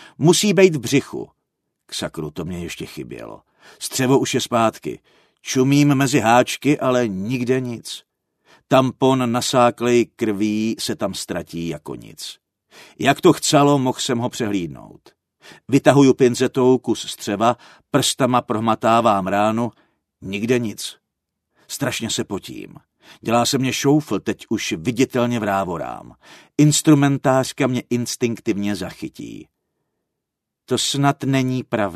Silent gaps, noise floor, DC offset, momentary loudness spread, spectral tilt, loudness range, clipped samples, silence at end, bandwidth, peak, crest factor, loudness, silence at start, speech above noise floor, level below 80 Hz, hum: none; -81 dBFS; under 0.1%; 17 LU; -5 dB/octave; 6 LU; under 0.1%; 0 s; 13.5 kHz; 0 dBFS; 20 dB; -19 LUFS; 0 s; 62 dB; -58 dBFS; none